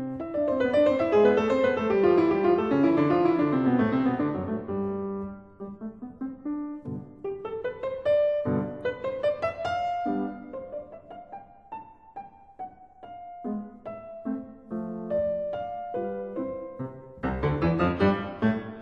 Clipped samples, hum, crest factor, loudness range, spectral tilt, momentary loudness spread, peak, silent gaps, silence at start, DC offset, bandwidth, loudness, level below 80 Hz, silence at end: under 0.1%; none; 18 dB; 16 LU; -8.5 dB/octave; 21 LU; -10 dBFS; none; 0 s; under 0.1%; 7.6 kHz; -27 LUFS; -52 dBFS; 0 s